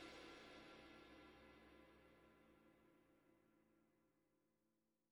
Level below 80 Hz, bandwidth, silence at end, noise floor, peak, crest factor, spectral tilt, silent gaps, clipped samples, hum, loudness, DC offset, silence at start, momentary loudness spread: -82 dBFS; 17.5 kHz; 0.15 s; -88 dBFS; -48 dBFS; 20 dB; -4 dB/octave; none; under 0.1%; none; -63 LUFS; under 0.1%; 0 s; 8 LU